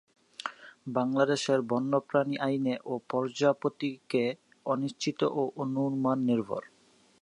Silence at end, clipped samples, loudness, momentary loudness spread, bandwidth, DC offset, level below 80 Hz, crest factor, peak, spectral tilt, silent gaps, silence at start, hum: 0.6 s; under 0.1%; -30 LUFS; 12 LU; 11 kHz; under 0.1%; -80 dBFS; 20 dB; -10 dBFS; -6 dB/octave; none; 0.4 s; none